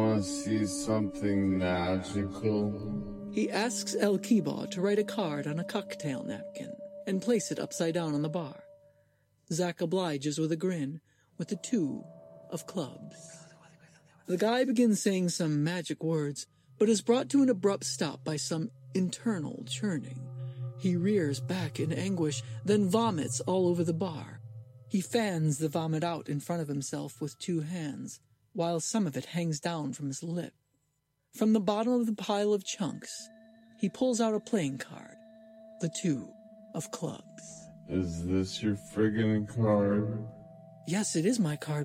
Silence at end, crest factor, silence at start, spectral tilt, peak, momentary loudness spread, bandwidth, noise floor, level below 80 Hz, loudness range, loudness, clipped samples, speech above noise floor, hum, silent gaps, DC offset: 0 s; 20 dB; 0 s; -5.5 dB/octave; -12 dBFS; 15 LU; 16 kHz; -78 dBFS; -64 dBFS; 5 LU; -31 LUFS; under 0.1%; 47 dB; none; none; under 0.1%